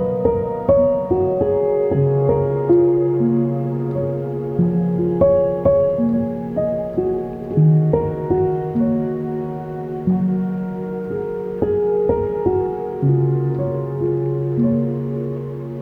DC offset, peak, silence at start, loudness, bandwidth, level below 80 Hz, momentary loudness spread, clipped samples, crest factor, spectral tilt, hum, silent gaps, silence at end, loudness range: under 0.1%; -2 dBFS; 0 s; -19 LUFS; 3.4 kHz; -44 dBFS; 9 LU; under 0.1%; 16 dB; -12.5 dB/octave; none; none; 0 s; 4 LU